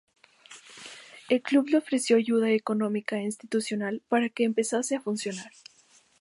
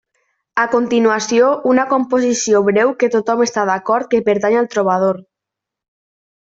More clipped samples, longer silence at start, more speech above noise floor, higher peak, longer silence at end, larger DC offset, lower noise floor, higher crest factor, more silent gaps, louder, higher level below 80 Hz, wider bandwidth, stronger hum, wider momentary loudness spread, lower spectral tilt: neither; about the same, 0.5 s vs 0.55 s; second, 35 dB vs 69 dB; second, -10 dBFS vs -2 dBFS; second, 0.75 s vs 1.3 s; neither; second, -61 dBFS vs -83 dBFS; about the same, 18 dB vs 14 dB; neither; second, -27 LUFS vs -15 LUFS; second, -80 dBFS vs -60 dBFS; first, 11.5 kHz vs 7.8 kHz; neither; first, 20 LU vs 4 LU; about the same, -4.5 dB/octave vs -4.5 dB/octave